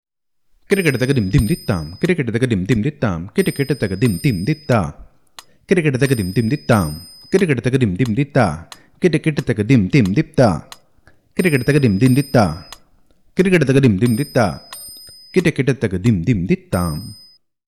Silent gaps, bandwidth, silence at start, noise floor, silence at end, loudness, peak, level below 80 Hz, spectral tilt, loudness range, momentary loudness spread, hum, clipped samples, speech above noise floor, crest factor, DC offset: none; 14 kHz; 0.7 s; -61 dBFS; 0.55 s; -17 LUFS; -2 dBFS; -42 dBFS; -7 dB/octave; 3 LU; 10 LU; none; under 0.1%; 45 dB; 16 dB; 0.2%